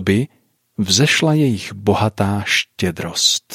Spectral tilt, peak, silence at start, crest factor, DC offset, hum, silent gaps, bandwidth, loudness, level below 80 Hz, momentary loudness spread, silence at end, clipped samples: -4 dB/octave; -2 dBFS; 0 s; 16 dB; under 0.1%; none; none; 16 kHz; -17 LUFS; -52 dBFS; 9 LU; 0 s; under 0.1%